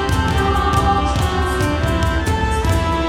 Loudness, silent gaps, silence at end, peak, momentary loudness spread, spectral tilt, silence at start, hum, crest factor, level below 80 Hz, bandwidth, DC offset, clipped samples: -18 LUFS; none; 0 s; -4 dBFS; 2 LU; -5.5 dB/octave; 0 s; none; 12 dB; -22 dBFS; 16.5 kHz; under 0.1%; under 0.1%